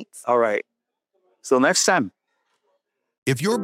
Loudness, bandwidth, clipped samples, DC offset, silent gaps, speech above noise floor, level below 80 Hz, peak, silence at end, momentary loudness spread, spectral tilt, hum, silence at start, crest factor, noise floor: -21 LUFS; 16 kHz; under 0.1%; under 0.1%; 3.18-3.22 s; 54 dB; -72 dBFS; -4 dBFS; 0 s; 13 LU; -3.5 dB/octave; none; 0 s; 18 dB; -74 dBFS